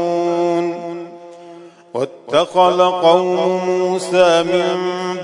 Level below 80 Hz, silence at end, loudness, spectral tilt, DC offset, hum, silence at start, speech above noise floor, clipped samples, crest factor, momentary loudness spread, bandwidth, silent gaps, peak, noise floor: -66 dBFS; 0 s; -16 LUFS; -5 dB/octave; under 0.1%; none; 0 s; 24 dB; under 0.1%; 16 dB; 13 LU; 11 kHz; none; 0 dBFS; -39 dBFS